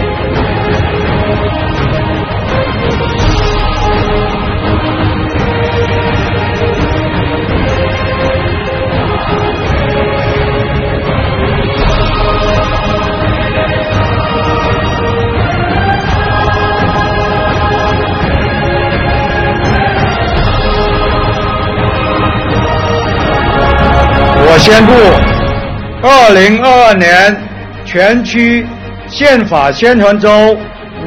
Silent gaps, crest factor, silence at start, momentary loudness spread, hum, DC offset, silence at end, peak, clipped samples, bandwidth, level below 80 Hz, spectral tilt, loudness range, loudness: none; 10 dB; 0 s; 8 LU; none; under 0.1%; 0 s; 0 dBFS; 1%; 12.5 kHz; -20 dBFS; -6 dB/octave; 6 LU; -10 LUFS